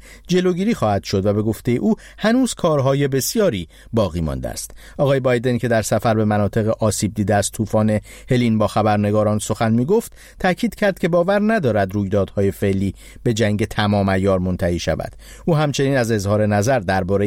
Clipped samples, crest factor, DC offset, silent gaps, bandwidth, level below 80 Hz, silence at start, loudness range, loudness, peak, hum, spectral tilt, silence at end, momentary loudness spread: under 0.1%; 16 dB; under 0.1%; none; 16.5 kHz; -40 dBFS; 0.05 s; 1 LU; -19 LUFS; -4 dBFS; none; -6 dB/octave; 0 s; 6 LU